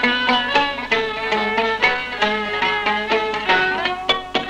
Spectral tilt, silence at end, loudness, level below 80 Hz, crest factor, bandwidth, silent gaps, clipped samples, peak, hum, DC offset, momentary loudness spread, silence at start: -3.5 dB/octave; 0 s; -18 LUFS; -48 dBFS; 16 dB; 12 kHz; none; under 0.1%; -4 dBFS; none; under 0.1%; 4 LU; 0 s